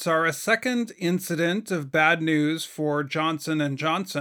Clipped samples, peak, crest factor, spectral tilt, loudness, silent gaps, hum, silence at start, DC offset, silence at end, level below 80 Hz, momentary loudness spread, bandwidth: under 0.1%; -6 dBFS; 20 dB; -5 dB/octave; -24 LUFS; none; none; 0 s; under 0.1%; 0 s; -76 dBFS; 6 LU; 19 kHz